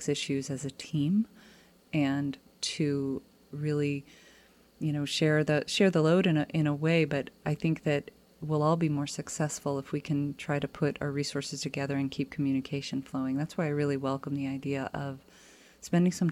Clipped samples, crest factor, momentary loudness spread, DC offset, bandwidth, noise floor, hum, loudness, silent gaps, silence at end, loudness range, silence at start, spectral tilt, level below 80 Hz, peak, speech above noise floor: under 0.1%; 16 dB; 10 LU; under 0.1%; 14 kHz; -60 dBFS; none; -30 LUFS; none; 0 s; 5 LU; 0 s; -6 dB/octave; -64 dBFS; -14 dBFS; 30 dB